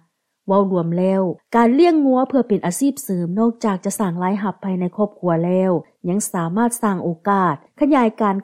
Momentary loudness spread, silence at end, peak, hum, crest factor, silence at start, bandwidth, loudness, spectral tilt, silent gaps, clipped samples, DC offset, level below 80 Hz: 7 LU; 0 s; -4 dBFS; none; 14 dB; 0.45 s; 16 kHz; -19 LUFS; -6.5 dB/octave; none; under 0.1%; under 0.1%; -62 dBFS